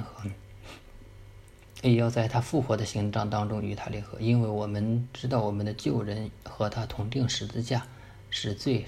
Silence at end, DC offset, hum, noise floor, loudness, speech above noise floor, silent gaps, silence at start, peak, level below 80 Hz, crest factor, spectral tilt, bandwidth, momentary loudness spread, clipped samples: 0 s; under 0.1%; none; -50 dBFS; -30 LUFS; 22 dB; none; 0 s; -12 dBFS; -52 dBFS; 18 dB; -6.5 dB/octave; 12.5 kHz; 15 LU; under 0.1%